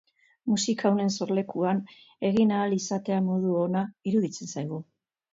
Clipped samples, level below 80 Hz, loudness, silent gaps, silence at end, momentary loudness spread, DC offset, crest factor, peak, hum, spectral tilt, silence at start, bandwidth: under 0.1%; -68 dBFS; -27 LUFS; none; 0.5 s; 10 LU; under 0.1%; 16 dB; -12 dBFS; none; -5.5 dB/octave; 0.45 s; 7.8 kHz